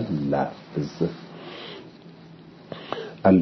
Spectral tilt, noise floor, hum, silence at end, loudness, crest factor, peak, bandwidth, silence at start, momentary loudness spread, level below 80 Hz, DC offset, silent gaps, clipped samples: -8.5 dB/octave; -46 dBFS; none; 0 s; -27 LUFS; 22 dB; -4 dBFS; 6.2 kHz; 0 s; 22 LU; -60 dBFS; under 0.1%; none; under 0.1%